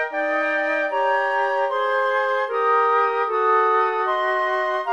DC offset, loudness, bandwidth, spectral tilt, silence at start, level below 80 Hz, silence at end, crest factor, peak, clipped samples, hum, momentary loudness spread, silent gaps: 0.1%; -20 LUFS; 10.5 kHz; -2 dB/octave; 0 s; -78 dBFS; 0 s; 12 dB; -8 dBFS; under 0.1%; none; 4 LU; none